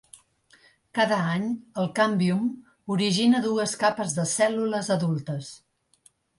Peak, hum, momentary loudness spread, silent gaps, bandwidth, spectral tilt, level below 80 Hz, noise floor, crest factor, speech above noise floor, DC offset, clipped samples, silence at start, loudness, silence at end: -8 dBFS; none; 10 LU; none; 11.5 kHz; -5 dB/octave; -68 dBFS; -62 dBFS; 18 dB; 38 dB; under 0.1%; under 0.1%; 0.95 s; -25 LUFS; 0.8 s